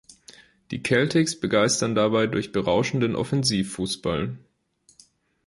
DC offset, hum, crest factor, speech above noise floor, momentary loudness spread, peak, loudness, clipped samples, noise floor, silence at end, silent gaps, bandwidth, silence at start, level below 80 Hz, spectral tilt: under 0.1%; none; 18 dB; 39 dB; 9 LU; -6 dBFS; -23 LUFS; under 0.1%; -62 dBFS; 1.1 s; none; 11.5 kHz; 0.7 s; -52 dBFS; -4.5 dB/octave